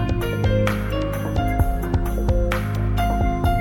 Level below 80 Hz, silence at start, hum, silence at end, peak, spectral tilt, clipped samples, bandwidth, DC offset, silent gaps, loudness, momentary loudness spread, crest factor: -24 dBFS; 0 s; none; 0 s; -6 dBFS; -7 dB/octave; under 0.1%; 17.5 kHz; under 0.1%; none; -22 LUFS; 3 LU; 14 dB